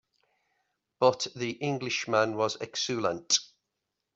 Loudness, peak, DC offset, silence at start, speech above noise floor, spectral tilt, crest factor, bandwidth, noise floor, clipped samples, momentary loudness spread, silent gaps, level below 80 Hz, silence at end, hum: -29 LUFS; -8 dBFS; under 0.1%; 1 s; 55 dB; -3 dB/octave; 22 dB; 8 kHz; -84 dBFS; under 0.1%; 6 LU; none; -74 dBFS; 0.7 s; none